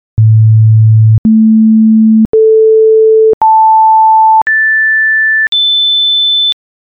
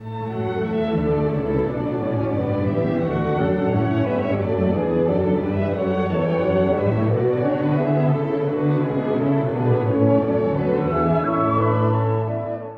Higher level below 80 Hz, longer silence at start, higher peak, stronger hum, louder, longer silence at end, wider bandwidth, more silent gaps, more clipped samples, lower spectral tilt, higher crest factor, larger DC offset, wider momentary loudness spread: first, -38 dBFS vs -44 dBFS; first, 0.15 s vs 0 s; first, -2 dBFS vs -6 dBFS; neither; first, -6 LUFS vs -21 LUFS; first, 0.3 s vs 0 s; second, 4.1 kHz vs 5.2 kHz; first, 1.18-1.24 s, 2.25-2.33 s, 3.34-3.41 s, 4.42-4.46 s, 5.48-5.52 s vs none; neither; second, -9 dB/octave vs -10.5 dB/octave; second, 6 dB vs 14 dB; neither; about the same, 2 LU vs 4 LU